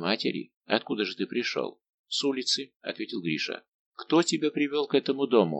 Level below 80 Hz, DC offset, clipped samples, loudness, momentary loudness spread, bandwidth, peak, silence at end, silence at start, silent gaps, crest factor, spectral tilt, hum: -80 dBFS; under 0.1%; under 0.1%; -28 LUFS; 11 LU; 9 kHz; -6 dBFS; 0 s; 0 s; 0.56-0.61 s, 1.89-2.04 s, 2.76-2.80 s, 3.68-3.92 s; 22 dB; -4 dB/octave; none